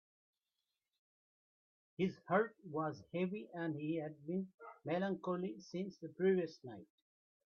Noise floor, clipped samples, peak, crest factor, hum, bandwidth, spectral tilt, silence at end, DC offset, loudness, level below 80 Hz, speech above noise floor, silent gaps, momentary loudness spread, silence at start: under -90 dBFS; under 0.1%; -20 dBFS; 22 dB; none; 6.8 kHz; -8 dB/octave; 0.7 s; under 0.1%; -41 LUFS; -84 dBFS; over 50 dB; 4.54-4.58 s; 15 LU; 2 s